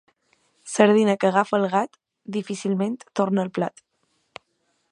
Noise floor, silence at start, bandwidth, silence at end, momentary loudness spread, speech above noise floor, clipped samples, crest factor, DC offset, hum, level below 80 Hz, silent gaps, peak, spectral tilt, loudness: -71 dBFS; 0.65 s; 11 kHz; 1.25 s; 14 LU; 49 dB; under 0.1%; 24 dB; under 0.1%; none; -74 dBFS; none; 0 dBFS; -5.5 dB/octave; -22 LUFS